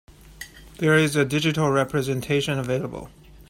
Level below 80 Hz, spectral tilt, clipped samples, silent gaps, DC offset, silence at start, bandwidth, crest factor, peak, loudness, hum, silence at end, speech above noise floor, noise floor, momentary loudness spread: -50 dBFS; -5.5 dB/octave; under 0.1%; none; under 0.1%; 0.25 s; 16.5 kHz; 18 dB; -6 dBFS; -22 LUFS; none; 0.05 s; 21 dB; -43 dBFS; 21 LU